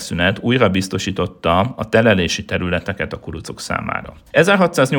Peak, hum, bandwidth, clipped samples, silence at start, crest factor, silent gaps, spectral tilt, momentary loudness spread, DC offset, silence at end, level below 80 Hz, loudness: 0 dBFS; none; 18 kHz; under 0.1%; 0 s; 16 dB; none; -5 dB/octave; 12 LU; under 0.1%; 0 s; -46 dBFS; -17 LUFS